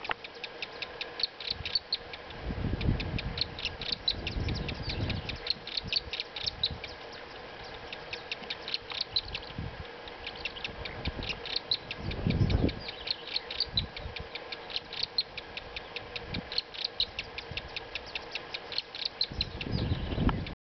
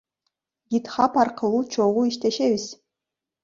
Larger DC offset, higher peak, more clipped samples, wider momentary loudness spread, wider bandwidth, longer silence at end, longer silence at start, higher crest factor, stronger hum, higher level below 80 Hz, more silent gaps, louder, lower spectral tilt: neither; second, -12 dBFS vs -6 dBFS; neither; first, 10 LU vs 7 LU; second, 6.4 kHz vs 7.6 kHz; second, 0.15 s vs 0.7 s; second, 0 s vs 0.7 s; about the same, 22 dB vs 18 dB; neither; first, -44 dBFS vs -66 dBFS; neither; second, -34 LUFS vs -23 LUFS; second, -3 dB/octave vs -5 dB/octave